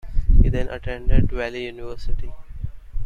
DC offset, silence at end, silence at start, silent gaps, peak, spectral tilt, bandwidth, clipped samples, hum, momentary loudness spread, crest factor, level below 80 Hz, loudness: under 0.1%; 0 s; 0.05 s; none; -2 dBFS; -8 dB/octave; 5.2 kHz; under 0.1%; none; 16 LU; 16 dB; -20 dBFS; -25 LUFS